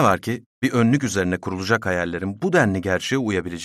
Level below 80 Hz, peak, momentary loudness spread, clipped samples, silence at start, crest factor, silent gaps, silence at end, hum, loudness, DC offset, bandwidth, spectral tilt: -58 dBFS; -4 dBFS; 7 LU; under 0.1%; 0 s; 16 dB; 0.46-0.62 s; 0 s; none; -22 LUFS; under 0.1%; 14 kHz; -5.5 dB/octave